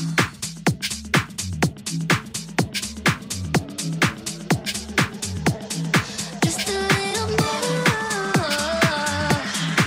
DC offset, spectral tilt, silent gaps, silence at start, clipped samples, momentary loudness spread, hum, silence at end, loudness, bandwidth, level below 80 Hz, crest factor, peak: under 0.1%; -4 dB/octave; none; 0 s; under 0.1%; 6 LU; none; 0 s; -23 LUFS; 16 kHz; -46 dBFS; 18 dB; -4 dBFS